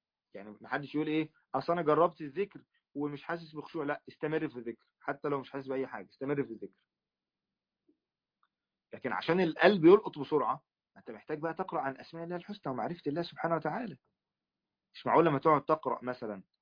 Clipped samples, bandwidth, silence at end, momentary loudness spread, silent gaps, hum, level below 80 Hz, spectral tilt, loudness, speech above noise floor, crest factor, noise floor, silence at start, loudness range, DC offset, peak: under 0.1%; 5.2 kHz; 0.2 s; 17 LU; none; none; -76 dBFS; -5 dB/octave; -32 LUFS; over 58 dB; 26 dB; under -90 dBFS; 0.35 s; 10 LU; under 0.1%; -8 dBFS